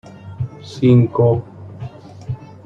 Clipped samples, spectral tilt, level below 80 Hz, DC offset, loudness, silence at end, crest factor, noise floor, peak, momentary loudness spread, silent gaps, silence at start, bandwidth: under 0.1%; -9.5 dB/octave; -48 dBFS; under 0.1%; -17 LUFS; 0.2 s; 16 dB; -33 dBFS; -2 dBFS; 23 LU; none; 0.25 s; 7.2 kHz